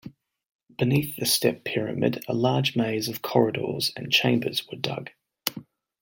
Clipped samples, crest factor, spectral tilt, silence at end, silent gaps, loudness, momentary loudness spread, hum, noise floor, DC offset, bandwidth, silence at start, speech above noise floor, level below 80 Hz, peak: under 0.1%; 26 dB; -4.5 dB/octave; 0.4 s; 0.46-0.59 s; -25 LUFS; 9 LU; none; -45 dBFS; under 0.1%; 17 kHz; 0.05 s; 20 dB; -64 dBFS; 0 dBFS